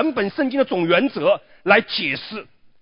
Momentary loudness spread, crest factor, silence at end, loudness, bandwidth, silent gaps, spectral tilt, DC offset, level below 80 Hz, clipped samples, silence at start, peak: 10 LU; 20 dB; 0.4 s; -19 LUFS; 5.4 kHz; none; -9.5 dB/octave; under 0.1%; -62 dBFS; under 0.1%; 0 s; 0 dBFS